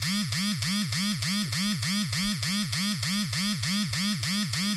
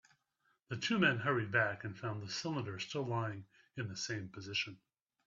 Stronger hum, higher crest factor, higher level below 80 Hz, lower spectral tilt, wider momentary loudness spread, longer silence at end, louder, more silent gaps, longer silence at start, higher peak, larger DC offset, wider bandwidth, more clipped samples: neither; second, 16 dB vs 22 dB; first, -56 dBFS vs -76 dBFS; second, -3 dB/octave vs -4.5 dB/octave; second, 1 LU vs 12 LU; second, 0 s vs 0.5 s; first, -27 LUFS vs -37 LUFS; neither; second, 0 s vs 0.7 s; first, -12 dBFS vs -16 dBFS; neither; first, 15.5 kHz vs 7.8 kHz; neither